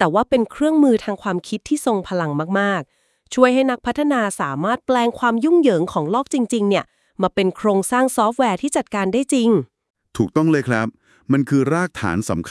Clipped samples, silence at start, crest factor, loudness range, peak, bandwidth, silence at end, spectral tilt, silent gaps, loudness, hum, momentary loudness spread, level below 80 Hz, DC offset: under 0.1%; 0 s; 18 dB; 2 LU; 0 dBFS; 12 kHz; 0 s; -5.5 dB/octave; 9.90-9.94 s; -19 LUFS; none; 8 LU; -54 dBFS; under 0.1%